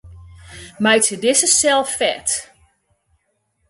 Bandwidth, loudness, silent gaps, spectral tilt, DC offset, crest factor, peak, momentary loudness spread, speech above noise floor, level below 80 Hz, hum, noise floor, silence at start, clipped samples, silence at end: 12 kHz; -16 LUFS; none; -1.5 dB/octave; under 0.1%; 18 dB; -2 dBFS; 11 LU; 51 dB; -50 dBFS; none; -67 dBFS; 0.05 s; under 0.1%; 1.25 s